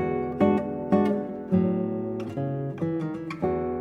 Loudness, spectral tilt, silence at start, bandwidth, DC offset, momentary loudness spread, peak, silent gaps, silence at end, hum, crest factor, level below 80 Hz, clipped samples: -27 LUFS; -9.5 dB/octave; 0 s; 7 kHz; under 0.1%; 7 LU; -8 dBFS; none; 0 s; none; 18 dB; -54 dBFS; under 0.1%